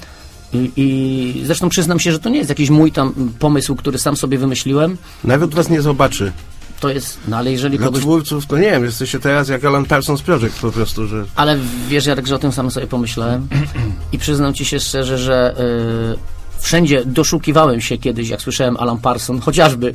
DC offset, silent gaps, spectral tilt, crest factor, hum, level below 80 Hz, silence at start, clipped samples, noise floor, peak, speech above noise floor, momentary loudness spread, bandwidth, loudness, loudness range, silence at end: under 0.1%; none; -5 dB/octave; 16 dB; none; -32 dBFS; 0 s; under 0.1%; -36 dBFS; 0 dBFS; 21 dB; 8 LU; 16 kHz; -16 LUFS; 3 LU; 0 s